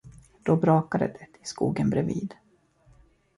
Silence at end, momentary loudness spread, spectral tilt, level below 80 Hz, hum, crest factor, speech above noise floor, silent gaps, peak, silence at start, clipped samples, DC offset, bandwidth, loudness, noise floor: 1.05 s; 17 LU; -7.5 dB/octave; -56 dBFS; none; 18 dB; 35 dB; none; -8 dBFS; 0.05 s; under 0.1%; under 0.1%; 11.5 kHz; -26 LUFS; -60 dBFS